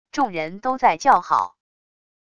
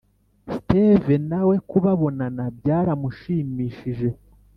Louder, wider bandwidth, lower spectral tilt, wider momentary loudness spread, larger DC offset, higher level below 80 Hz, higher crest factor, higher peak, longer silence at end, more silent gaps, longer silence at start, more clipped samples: about the same, -20 LUFS vs -22 LUFS; first, 11 kHz vs 5.4 kHz; second, -4 dB/octave vs -11 dB/octave; about the same, 9 LU vs 11 LU; neither; second, -60 dBFS vs -48 dBFS; about the same, 18 dB vs 20 dB; about the same, -4 dBFS vs -2 dBFS; first, 0.8 s vs 0.45 s; neither; second, 0.15 s vs 0.45 s; neither